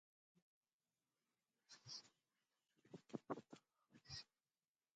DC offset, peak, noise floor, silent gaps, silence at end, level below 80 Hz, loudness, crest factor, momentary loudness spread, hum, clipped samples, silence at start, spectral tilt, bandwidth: under 0.1%; -32 dBFS; under -90 dBFS; none; 0.7 s; -86 dBFS; -56 LUFS; 30 dB; 15 LU; none; under 0.1%; 1.7 s; -4 dB/octave; 8.8 kHz